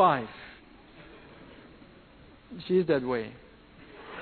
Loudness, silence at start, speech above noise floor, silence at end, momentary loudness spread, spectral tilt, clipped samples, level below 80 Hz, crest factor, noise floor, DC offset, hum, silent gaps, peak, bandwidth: -29 LUFS; 0 s; 28 dB; 0 s; 27 LU; -5 dB/octave; under 0.1%; -60 dBFS; 22 dB; -54 dBFS; under 0.1%; none; none; -10 dBFS; 4.5 kHz